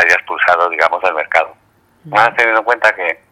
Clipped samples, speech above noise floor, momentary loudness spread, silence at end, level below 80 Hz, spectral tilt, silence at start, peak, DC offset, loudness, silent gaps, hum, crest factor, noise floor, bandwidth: 0.2%; 40 dB; 6 LU; 0.2 s; -58 dBFS; -3 dB/octave; 0 s; 0 dBFS; under 0.1%; -13 LUFS; none; none; 14 dB; -54 dBFS; 17 kHz